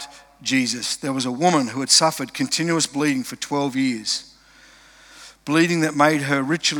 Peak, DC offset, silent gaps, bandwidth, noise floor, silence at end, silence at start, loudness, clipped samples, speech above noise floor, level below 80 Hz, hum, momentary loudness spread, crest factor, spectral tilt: -2 dBFS; under 0.1%; none; 19.5 kHz; -50 dBFS; 0 s; 0 s; -20 LUFS; under 0.1%; 30 dB; -64 dBFS; none; 10 LU; 20 dB; -3 dB/octave